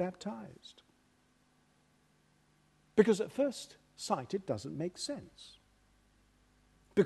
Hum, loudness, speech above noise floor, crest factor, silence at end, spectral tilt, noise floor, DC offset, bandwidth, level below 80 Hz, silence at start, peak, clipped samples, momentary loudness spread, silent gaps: 50 Hz at -65 dBFS; -35 LUFS; 36 dB; 28 dB; 0 s; -5.5 dB/octave; -71 dBFS; under 0.1%; 12.5 kHz; -72 dBFS; 0 s; -10 dBFS; under 0.1%; 24 LU; none